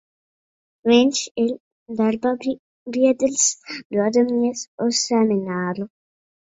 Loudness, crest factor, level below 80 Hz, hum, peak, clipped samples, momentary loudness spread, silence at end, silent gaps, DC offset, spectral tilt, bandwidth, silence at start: -20 LUFS; 18 dB; -64 dBFS; none; -2 dBFS; under 0.1%; 13 LU; 0.7 s; 1.31-1.35 s, 1.60-1.86 s, 2.59-2.86 s, 3.85-3.90 s, 4.67-4.78 s; under 0.1%; -3.5 dB/octave; 8 kHz; 0.85 s